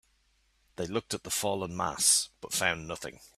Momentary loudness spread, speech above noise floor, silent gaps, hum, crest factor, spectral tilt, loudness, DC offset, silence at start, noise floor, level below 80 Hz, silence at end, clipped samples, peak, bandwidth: 15 LU; 39 dB; none; none; 22 dB; -1.5 dB/octave; -29 LUFS; under 0.1%; 0.8 s; -70 dBFS; -62 dBFS; 0.1 s; under 0.1%; -10 dBFS; 15.5 kHz